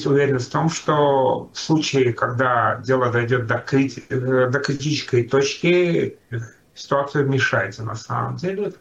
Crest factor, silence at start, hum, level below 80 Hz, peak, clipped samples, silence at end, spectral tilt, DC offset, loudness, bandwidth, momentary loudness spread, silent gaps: 14 dB; 0 s; none; -58 dBFS; -6 dBFS; under 0.1%; 0.05 s; -5.5 dB/octave; under 0.1%; -20 LUFS; 8.4 kHz; 8 LU; none